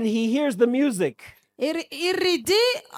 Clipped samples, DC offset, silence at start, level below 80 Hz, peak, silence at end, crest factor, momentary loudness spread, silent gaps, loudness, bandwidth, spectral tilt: under 0.1%; under 0.1%; 0 s; -66 dBFS; -8 dBFS; 0 s; 16 dB; 7 LU; none; -23 LUFS; 18 kHz; -4 dB/octave